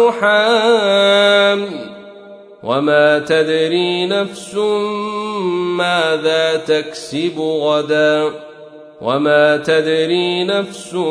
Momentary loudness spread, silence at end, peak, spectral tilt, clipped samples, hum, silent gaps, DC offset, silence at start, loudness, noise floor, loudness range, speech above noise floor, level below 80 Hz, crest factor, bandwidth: 9 LU; 0 s; 0 dBFS; -4.5 dB/octave; under 0.1%; none; none; under 0.1%; 0 s; -15 LUFS; -38 dBFS; 3 LU; 23 dB; -64 dBFS; 14 dB; 10.5 kHz